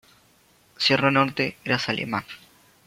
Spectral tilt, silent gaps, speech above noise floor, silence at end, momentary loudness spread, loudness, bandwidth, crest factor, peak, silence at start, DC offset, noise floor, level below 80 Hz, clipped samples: -5 dB/octave; none; 36 dB; 0.5 s; 14 LU; -23 LUFS; 16 kHz; 22 dB; -4 dBFS; 0.8 s; under 0.1%; -59 dBFS; -62 dBFS; under 0.1%